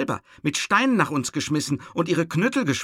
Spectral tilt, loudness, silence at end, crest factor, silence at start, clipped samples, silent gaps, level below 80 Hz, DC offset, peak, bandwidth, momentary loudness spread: -4.5 dB/octave; -23 LUFS; 0 s; 18 dB; 0 s; under 0.1%; none; -62 dBFS; under 0.1%; -6 dBFS; 15.5 kHz; 7 LU